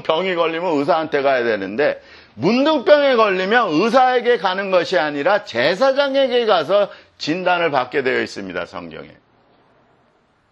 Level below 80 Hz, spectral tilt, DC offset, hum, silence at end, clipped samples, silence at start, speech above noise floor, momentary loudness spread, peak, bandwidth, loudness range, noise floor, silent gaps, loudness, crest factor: -64 dBFS; -5 dB/octave; under 0.1%; none; 1.45 s; under 0.1%; 0.05 s; 42 dB; 11 LU; 0 dBFS; 8.4 kHz; 6 LU; -59 dBFS; none; -17 LUFS; 18 dB